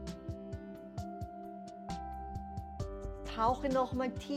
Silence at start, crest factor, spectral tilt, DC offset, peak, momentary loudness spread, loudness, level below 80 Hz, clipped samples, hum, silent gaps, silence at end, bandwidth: 0 s; 18 dB; -6.5 dB/octave; under 0.1%; -20 dBFS; 13 LU; -39 LUFS; -50 dBFS; under 0.1%; none; none; 0 s; 15.5 kHz